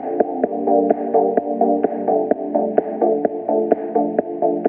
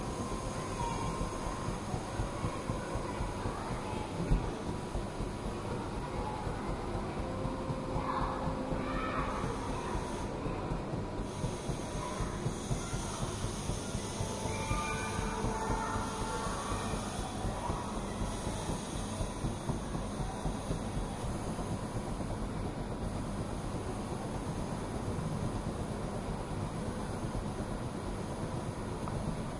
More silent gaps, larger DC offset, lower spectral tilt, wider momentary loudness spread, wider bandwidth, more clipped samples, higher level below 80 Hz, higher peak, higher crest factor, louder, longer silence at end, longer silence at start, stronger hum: neither; neither; first, -13 dB/octave vs -5.5 dB/octave; about the same, 3 LU vs 4 LU; second, 3 kHz vs 11.5 kHz; neither; second, -72 dBFS vs -44 dBFS; first, 0 dBFS vs -18 dBFS; about the same, 18 dB vs 20 dB; first, -19 LUFS vs -37 LUFS; about the same, 0 s vs 0 s; about the same, 0 s vs 0 s; neither